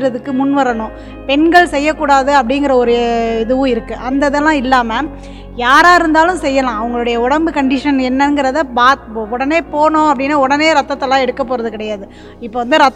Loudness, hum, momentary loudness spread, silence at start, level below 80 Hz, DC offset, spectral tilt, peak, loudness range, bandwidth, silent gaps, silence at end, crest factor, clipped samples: -12 LUFS; none; 12 LU; 0 s; -36 dBFS; under 0.1%; -4 dB/octave; 0 dBFS; 2 LU; 12.5 kHz; none; 0 s; 12 dB; 0.4%